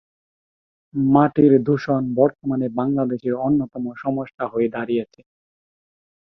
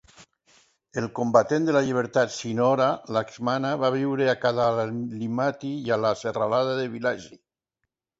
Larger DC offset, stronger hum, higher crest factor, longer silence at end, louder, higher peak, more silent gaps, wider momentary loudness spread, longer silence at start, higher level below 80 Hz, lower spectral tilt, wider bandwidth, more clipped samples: neither; neither; about the same, 20 dB vs 20 dB; first, 1.25 s vs 0.85 s; first, -20 LUFS vs -25 LUFS; about the same, -2 dBFS vs -4 dBFS; first, 4.34-4.38 s vs none; first, 11 LU vs 8 LU; first, 0.95 s vs 0.2 s; first, -58 dBFS vs -64 dBFS; first, -10 dB/octave vs -6 dB/octave; second, 6 kHz vs 8 kHz; neither